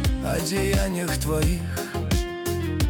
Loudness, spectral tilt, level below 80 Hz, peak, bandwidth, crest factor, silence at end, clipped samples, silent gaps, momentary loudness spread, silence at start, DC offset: -25 LUFS; -5 dB/octave; -30 dBFS; -12 dBFS; 19 kHz; 12 dB; 0 s; under 0.1%; none; 5 LU; 0 s; under 0.1%